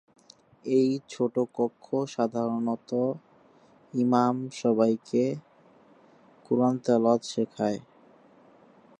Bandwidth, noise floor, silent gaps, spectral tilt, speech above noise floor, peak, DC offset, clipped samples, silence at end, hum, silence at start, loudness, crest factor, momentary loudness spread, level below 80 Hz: 9.4 kHz; -58 dBFS; none; -7 dB/octave; 32 dB; -8 dBFS; under 0.1%; under 0.1%; 1.2 s; none; 0.65 s; -27 LUFS; 20 dB; 8 LU; -76 dBFS